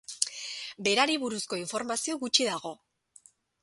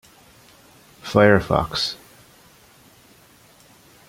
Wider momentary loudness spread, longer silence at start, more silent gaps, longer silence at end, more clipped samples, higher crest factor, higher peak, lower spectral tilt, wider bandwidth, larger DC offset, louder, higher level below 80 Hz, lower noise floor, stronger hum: second, 12 LU vs 20 LU; second, 0.1 s vs 1.05 s; neither; second, 0.9 s vs 2.15 s; neither; first, 28 dB vs 22 dB; about the same, -2 dBFS vs -2 dBFS; second, -1.5 dB/octave vs -5.5 dB/octave; second, 12 kHz vs 16.5 kHz; neither; second, -29 LUFS vs -19 LUFS; second, -76 dBFS vs -46 dBFS; first, -60 dBFS vs -52 dBFS; neither